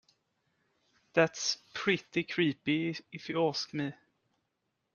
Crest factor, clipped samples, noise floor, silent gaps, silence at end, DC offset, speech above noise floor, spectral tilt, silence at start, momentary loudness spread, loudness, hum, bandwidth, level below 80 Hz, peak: 26 dB; under 0.1%; -82 dBFS; none; 1 s; under 0.1%; 50 dB; -4 dB/octave; 1.15 s; 8 LU; -32 LUFS; none; 7.4 kHz; -76 dBFS; -10 dBFS